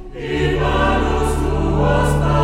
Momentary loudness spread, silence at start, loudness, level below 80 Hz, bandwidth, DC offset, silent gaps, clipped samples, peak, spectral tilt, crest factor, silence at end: 3 LU; 0 s; -18 LUFS; -22 dBFS; 14 kHz; under 0.1%; none; under 0.1%; -4 dBFS; -6.5 dB/octave; 14 dB; 0 s